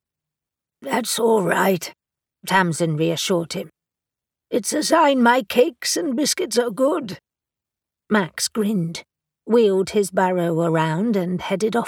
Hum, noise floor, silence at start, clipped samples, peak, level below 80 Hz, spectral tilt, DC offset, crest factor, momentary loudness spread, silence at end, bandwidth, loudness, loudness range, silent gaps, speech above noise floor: none; -87 dBFS; 0.8 s; under 0.1%; -4 dBFS; -64 dBFS; -4.5 dB/octave; under 0.1%; 18 dB; 11 LU; 0 s; 19 kHz; -20 LUFS; 4 LU; none; 68 dB